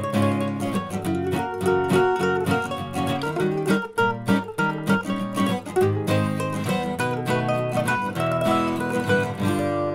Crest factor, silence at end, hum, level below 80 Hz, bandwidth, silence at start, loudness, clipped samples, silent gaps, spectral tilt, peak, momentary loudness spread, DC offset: 16 dB; 0 s; none; -54 dBFS; 16 kHz; 0 s; -23 LUFS; under 0.1%; none; -6 dB/octave; -6 dBFS; 5 LU; under 0.1%